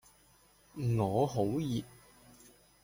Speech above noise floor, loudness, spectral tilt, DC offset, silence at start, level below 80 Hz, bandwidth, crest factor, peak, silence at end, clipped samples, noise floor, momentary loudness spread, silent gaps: 33 dB; -33 LUFS; -7.5 dB/octave; under 0.1%; 0.75 s; -62 dBFS; 16.5 kHz; 18 dB; -18 dBFS; 0.95 s; under 0.1%; -65 dBFS; 16 LU; none